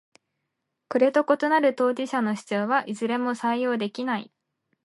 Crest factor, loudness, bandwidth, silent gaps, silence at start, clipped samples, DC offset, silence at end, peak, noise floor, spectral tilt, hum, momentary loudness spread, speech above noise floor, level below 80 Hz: 18 dB; -24 LUFS; 11.5 kHz; none; 0.9 s; under 0.1%; under 0.1%; 0.6 s; -8 dBFS; -80 dBFS; -5.5 dB/octave; none; 8 LU; 57 dB; -80 dBFS